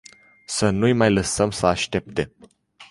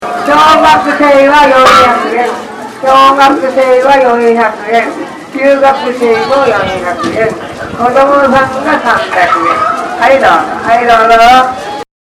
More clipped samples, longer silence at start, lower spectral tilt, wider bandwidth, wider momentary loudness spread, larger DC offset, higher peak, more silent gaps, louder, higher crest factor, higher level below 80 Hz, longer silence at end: second, under 0.1% vs 4%; first, 0.5 s vs 0 s; about the same, -4.5 dB/octave vs -4 dB/octave; second, 11.5 kHz vs 16 kHz; about the same, 10 LU vs 10 LU; neither; about the same, -2 dBFS vs 0 dBFS; neither; second, -21 LUFS vs -7 LUFS; first, 20 dB vs 8 dB; second, -44 dBFS vs -38 dBFS; second, 0.05 s vs 0.2 s